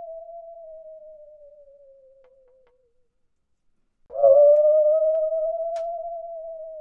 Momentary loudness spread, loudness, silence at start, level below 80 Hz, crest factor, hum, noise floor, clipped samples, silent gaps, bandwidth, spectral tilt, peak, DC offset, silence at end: 27 LU; -19 LUFS; 0 s; -66 dBFS; 18 dB; none; -69 dBFS; under 0.1%; none; 1.8 kHz; -5 dB/octave; -6 dBFS; under 0.1%; 0 s